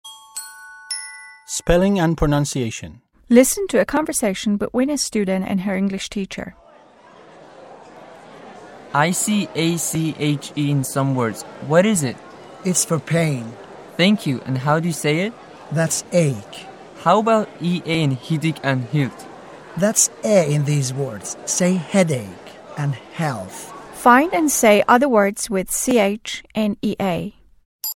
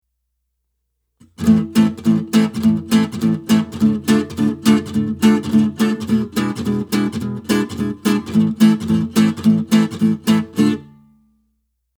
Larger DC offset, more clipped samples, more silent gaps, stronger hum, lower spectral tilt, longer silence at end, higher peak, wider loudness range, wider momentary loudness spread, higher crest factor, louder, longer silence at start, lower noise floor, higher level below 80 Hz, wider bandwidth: neither; neither; first, 27.65-27.79 s vs none; neither; second, -4.5 dB/octave vs -6 dB/octave; second, 0 s vs 1.15 s; about the same, 0 dBFS vs 0 dBFS; first, 6 LU vs 2 LU; first, 19 LU vs 6 LU; about the same, 20 dB vs 16 dB; about the same, -19 LUFS vs -17 LUFS; second, 0.05 s vs 1.4 s; second, -47 dBFS vs -72 dBFS; first, -42 dBFS vs -50 dBFS; second, 16.5 kHz vs over 20 kHz